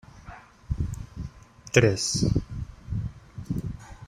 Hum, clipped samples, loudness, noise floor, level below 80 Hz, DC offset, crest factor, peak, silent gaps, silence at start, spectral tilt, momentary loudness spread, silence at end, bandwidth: none; under 0.1%; -27 LUFS; -47 dBFS; -40 dBFS; under 0.1%; 26 dB; -2 dBFS; none; 0.15 s; -5 dB/octave; 25 LU; 0 s; 16 kHz